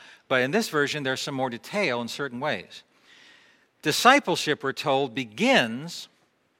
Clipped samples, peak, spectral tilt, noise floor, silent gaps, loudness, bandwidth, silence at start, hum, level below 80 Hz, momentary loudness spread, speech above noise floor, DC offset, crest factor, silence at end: under 0.1%; -2 dBFS; -3.5 dB/octave; -59 dBFS; none; -24 LUFS; 16 kHz; 0 s; none; -74 dBFS; 12 LU; 34 dB; under 0.1%; 24 dB; 0.55 s